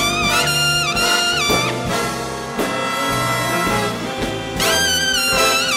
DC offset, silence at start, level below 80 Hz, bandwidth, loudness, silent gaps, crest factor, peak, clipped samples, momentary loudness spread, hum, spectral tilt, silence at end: under 0.1%; 0 s; -40 dBFS; 16 kHz; -17 LUFS; none; 16 dB; -4 dBFS; under 0.1%; 8 LU; none; -2.5 dB/octave; 0 s